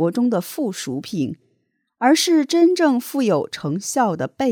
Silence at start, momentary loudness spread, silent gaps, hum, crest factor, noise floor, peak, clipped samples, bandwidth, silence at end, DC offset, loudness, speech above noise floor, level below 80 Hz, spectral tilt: 0 s; 11 LU; none; none; 16 dB; -69 dBFS; -4 dBFS; under 0.1%; 19 kHz; 0 s; under 0.1%; -20 LUFS; 50 dB; -66 dBFS; -4.5 dB/octave